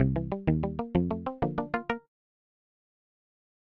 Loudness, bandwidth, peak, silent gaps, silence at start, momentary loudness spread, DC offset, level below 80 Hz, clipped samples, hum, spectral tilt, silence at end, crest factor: -31 LUFS; 5.8 kHz; -12 dBFS; none; 0 s; 4 LU; under 0.1%; -46 dBFS; under 0.1%; none; -10.5 dB/octave; 1.8 s; 20 dB